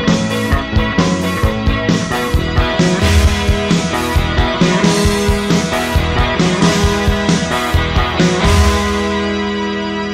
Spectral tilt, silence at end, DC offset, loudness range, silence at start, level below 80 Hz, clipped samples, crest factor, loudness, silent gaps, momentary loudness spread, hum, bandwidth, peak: -5 dB/octave; 0 s; under 0.1%; 1 LU; 0 s; -20 dBFS; under 0.1%; 12 dB; -14 LUFS; none; 4 LU; none; 16 kHz; -2 dBFS